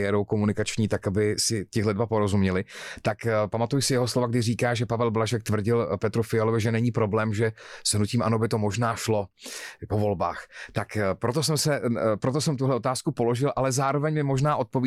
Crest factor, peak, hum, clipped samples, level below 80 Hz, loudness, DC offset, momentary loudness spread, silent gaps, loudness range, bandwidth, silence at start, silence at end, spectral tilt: 12 dB; -12 dBFS; none; under 0.1%; -56 dBFS; -25 LUFS; under 0.1%; 5 LU; none; 2 LU; 14.5 kHz; 0 s; 0 s; -5.5 dB/octave